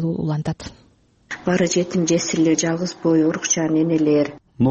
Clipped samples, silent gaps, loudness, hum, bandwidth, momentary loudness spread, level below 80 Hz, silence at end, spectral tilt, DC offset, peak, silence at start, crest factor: under 0.1%; none; -20 LUFS; none; 8.4 kHz; 10 LU; -52 dBFS; 0 s; -5 dB/octave; under 0.1%; -6 dBFS; 0 s; 14 dB